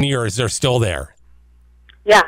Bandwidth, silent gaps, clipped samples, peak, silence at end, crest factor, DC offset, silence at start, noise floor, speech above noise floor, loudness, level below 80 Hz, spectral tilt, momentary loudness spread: 16 kHz; none; under 0.1%; -4 dBFS; 0 s; 14 dB; under 0.1%; 0 s; -49 dBFS; 31 dB; -18 LUFS; -40 dBFS; -4 dB/octave; 12 LU